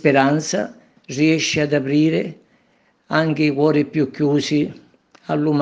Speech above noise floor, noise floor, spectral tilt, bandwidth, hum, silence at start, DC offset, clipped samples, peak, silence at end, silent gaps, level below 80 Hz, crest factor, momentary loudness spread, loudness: 42 dB; -60 dBFS; -5.5 dB/octave; 8 kHz; none; 0.05 s; under 0.1%; under 0.1%; 0 dBFS; 0 s; none; -62 dBFS; 18 dB; 10 LU; -19 LUFS